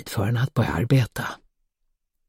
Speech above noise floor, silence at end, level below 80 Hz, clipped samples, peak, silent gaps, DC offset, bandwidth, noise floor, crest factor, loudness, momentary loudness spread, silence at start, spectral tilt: 51 dB; 0.95 s; -46 dBFS; under 0.1%; -8 dBFS; none; under 0.1%; 16.5 kHz; -74 dBFS; 18 dB; -24 LUFS; 12 LU; 0 s; -6.5 dB/octave